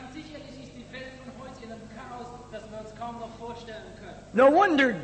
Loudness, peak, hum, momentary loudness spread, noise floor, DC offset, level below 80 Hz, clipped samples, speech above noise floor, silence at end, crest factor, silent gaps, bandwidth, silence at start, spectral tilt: -23 LUFS; -10 dBFS; 50 Hz at -50 dBFS; 23 LU; -44 dBFS; under 0.1%; -56 dBFS; under 0.1%; 20 dB; 0 s; 18 dB; none; 8.8 kHz; 0 s; -5.5 dB/octave